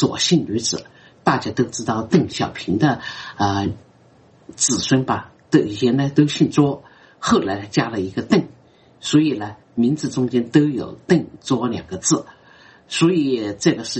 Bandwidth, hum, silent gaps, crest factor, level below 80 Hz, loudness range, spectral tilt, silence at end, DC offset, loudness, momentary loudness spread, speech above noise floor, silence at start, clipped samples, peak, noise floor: 8.8 kHz; none; none; 18 dB; -54 dBFS; 2 LU; -5 dB/octave; 0 s; under 0.1%; -20 LUFS; 9 LU; 32 dB; 0 s; under 0.1%; -2 dBFS; -51 dBFS